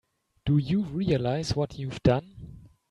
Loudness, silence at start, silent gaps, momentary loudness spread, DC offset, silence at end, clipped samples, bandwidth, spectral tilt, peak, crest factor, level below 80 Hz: -27 LUFS; 0.45 s; none; 18 LU; under 0.1%; 0.25 s; under 0.1%; 11 kHz; -7.5 dB/octave; -10 dBFS; 18 dB; -48 dBFS